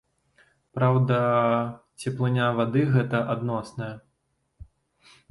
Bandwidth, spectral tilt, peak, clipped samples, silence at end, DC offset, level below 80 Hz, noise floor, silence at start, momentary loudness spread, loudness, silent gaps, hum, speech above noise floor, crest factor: 11.5 kHz; -8 dB/octave; -8 dBFS; under 0.1%; 0.7 s; under 0.1%; -60 dBFS; -74 dBFS; 0.75 s; 14 LU; -25 LUFS; none; none; 50 dB; 18 dB